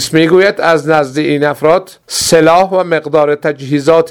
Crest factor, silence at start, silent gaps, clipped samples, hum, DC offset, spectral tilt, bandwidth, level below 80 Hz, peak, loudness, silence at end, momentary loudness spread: 10 dB; 0 s; none; 0.4%; none; 0.2%; -4.5 dB/octave; over 20 kHz; -48 dBFS; 0 dBFS; -11 LUFS; 0 s; 7 LU